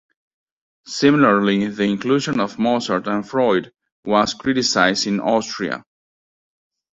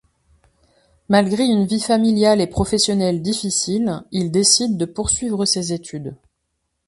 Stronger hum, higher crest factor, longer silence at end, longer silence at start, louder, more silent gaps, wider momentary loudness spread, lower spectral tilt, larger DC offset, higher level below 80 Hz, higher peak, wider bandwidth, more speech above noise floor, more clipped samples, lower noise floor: neither; about the same, 18 dB vs 18 dB; first, 1.15 s vs 0.75 s; second, 0.85 s vs 1.1 s; about the same, -18 LUFS vs -18 LUFS; first, 3.92-4.03 s vs none; about the same, 10 LU vs 9 LU; about the same, -4.5 dB/octave vs -4 dB/octave; neither; second, -58 dBFS vs -42 dBFS; about the same, -2 dBFS vs 0 dBFS; second, 8 kHz vs 11.5 kHz; first, over 72 dB vs 55 dB; neither; first, under -90 dBFS vs -73 dBFS